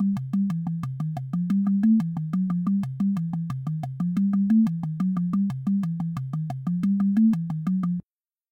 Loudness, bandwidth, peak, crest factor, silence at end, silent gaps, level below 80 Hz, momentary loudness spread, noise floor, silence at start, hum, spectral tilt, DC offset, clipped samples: -25 LUFS; 6.2 kHz; -14 dBFS; 12 dB; 0.5 s; none; -62 dBFS; 9 LU; -80 dBFS; 0 s; none; -10 dB/octave; under 0.1%; under 0.1%